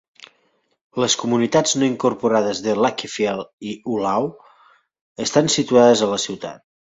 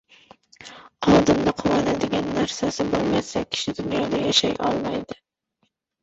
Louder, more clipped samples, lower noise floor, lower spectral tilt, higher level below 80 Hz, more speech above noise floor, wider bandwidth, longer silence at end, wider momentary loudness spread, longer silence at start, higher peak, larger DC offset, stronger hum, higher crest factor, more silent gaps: first, -19 LUFS vs -22 LUFS; neither; second, -65 dBFS vs -72 dBFS; about the same, -4 dB/octave vs -4.5 dB/octave; second, -60 dBFS vs -48 dBFS; about the same, 46 dB vs 48 dB; about the same, 8 kHz vs 8.2 kHz; second, 0.35 s vs 0.9 s; about the same, 14 LU vs 16 LU; first, 0.95 s vs 0.6 s; about the same, -2 dBFS vs -4 dBFS; neither; neither; about the same, 18 dB vs 20 dB; first, 3.53-3.58 s, 5.01-5.15 s vs none